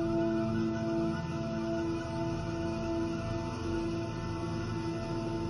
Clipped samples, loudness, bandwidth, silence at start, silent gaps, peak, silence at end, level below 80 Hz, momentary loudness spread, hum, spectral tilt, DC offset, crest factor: under 0.1%; -34 LUFS; 11 kHz; 0 s; none; -20 dBFS; 0 s; -50 dBFS; 5 LU; none; -7 dB/octave; under 0.1%; 12 dB